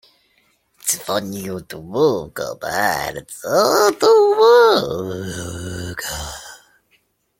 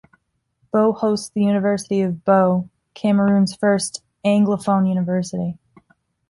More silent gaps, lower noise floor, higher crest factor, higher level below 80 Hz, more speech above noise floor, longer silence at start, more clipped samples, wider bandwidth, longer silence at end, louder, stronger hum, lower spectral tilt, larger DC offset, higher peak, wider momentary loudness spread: neither; about the same, -63 dBFS vs -66 dBFS; about the same, 16 dB vs 16 dB; first, -48 dBFS vs -58 dBFS; about the same, 46 dB vs 48 dB; about the same, 0.85 s vs 0.75 s; neither; first, 16.5 kHz vs 11.5 kHz; about the same, 0.85 s vs 0.75 s; about the same, -18 LUFS vs -19 LUFS; neither; second, -3.5 dB/octave vs -6.5 dB/octave; neither; about the same, -2 dBFS vs -4 dBFS; first, 16 LU vs 9 LU